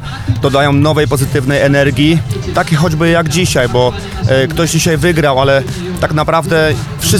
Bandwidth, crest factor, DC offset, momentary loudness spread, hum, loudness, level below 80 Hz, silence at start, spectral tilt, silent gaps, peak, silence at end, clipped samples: 17 kHz; 12 dB; under 0.1%; 5 LU; none; -12 LUFS; -30 dBFS; 0 s; -5 dB/octave; none; 0 dBFS; 0 s; under 0.1%